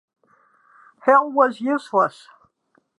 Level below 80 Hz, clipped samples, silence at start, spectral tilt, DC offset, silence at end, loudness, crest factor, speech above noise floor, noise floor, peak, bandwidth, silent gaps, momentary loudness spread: -82 dBFS; under 0.1%; 1.05 s; -6 dB/octave; under 0.1%; 0.9 s; -19 LUFS; 20 dB; 47 dB; -65 dBFS; -2 dBFS; 11 kHz; none; 8 LU